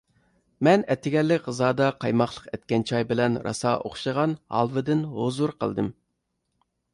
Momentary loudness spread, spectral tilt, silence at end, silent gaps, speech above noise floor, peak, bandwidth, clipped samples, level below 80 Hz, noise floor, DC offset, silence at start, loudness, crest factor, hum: 6 LU; -6.5 dB/octave; 1 s; none; 53 dB; -8 dBFS; 11.5 kHz; under 0.1%; -60 dBFS; -77 dBFS; under 0.1%; 0.6 s; -25 LUFS; 18 dB; none